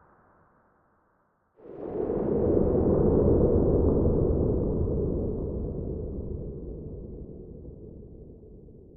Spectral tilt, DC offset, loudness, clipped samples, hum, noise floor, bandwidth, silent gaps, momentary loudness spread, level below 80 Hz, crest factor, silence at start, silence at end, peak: -14.5 dB/octave; under 0.1%; -26 LUFS; under 0.1%; none; -69 dBFS; 2.2 kHz; none; 22 LU; -36 dBFS; 18 dB; 1.65 s; 0 s; -10 dBFS